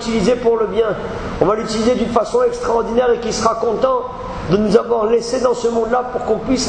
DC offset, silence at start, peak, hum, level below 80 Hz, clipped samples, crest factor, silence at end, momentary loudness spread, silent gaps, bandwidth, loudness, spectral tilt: under 0.1%; 0 s; 0 dBFS; none; -38 dBFS; under 0.1%; 16 dB; 0 s; 5 LU; none; 9.8 kHz; -17 LUFS; -5 dB/octave